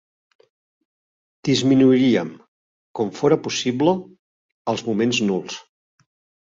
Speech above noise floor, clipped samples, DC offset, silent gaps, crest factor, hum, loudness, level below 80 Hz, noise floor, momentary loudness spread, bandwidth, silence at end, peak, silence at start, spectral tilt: over 71 dB; under 0.1%; under 0.1%; 2.48-2.94 s, 4.19-4.65 s; 18 dB; none; -20 LUFS; -62 dBFS; under -90 dBFS; 17 LU; 7.8 kHz; 0.85 s; -4 dBFS; 1.45 s; -5.5 dB/octave